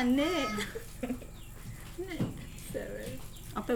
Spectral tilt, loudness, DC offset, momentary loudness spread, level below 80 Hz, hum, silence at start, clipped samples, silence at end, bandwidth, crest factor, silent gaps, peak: -5 dB/octave; -36 LUFS; under 0.1%; 16 LU; -48 dBFS; none; 0 s; under 0.1%; 0 s; over 20 kHz; 16 dB; none; -18 dBFS